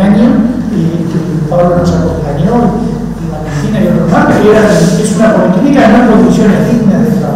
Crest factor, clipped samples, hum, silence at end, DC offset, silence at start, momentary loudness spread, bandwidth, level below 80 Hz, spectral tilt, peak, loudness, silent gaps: 8 dB; 1%; none; 0 s; under 0.1%; 0 s; 8 LU; 14.5 kHz; -28 dBFS; -7 dB/octave; 0 dBFS; -8 LUFS; none